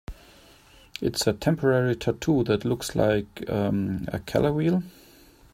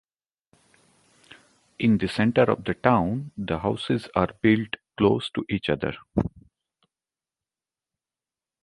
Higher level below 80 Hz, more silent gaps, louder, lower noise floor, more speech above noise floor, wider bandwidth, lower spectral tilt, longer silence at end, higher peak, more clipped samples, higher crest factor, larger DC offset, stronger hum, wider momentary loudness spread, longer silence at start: about the same, -48 dBFS vs -50 dBFS; neither; about the same, -25 LUFS vs -25 LUFS; second, -53 dBFS vs under -90 dBFS; second, 29 dB vs over 67 dB; first, 16 kHz vs 11.5 kHz; second, -6 dB/octave vs -7.5 dB/octave; second, 0.65 s vs 2.35 s; about the same, -6 dBFS vs -4 dBFS; neither; about the same, 20 dB vs 24 dB; neither; neither; about the same, 8 LU vs 7 LU; second, 0.1 s vs 1.8 s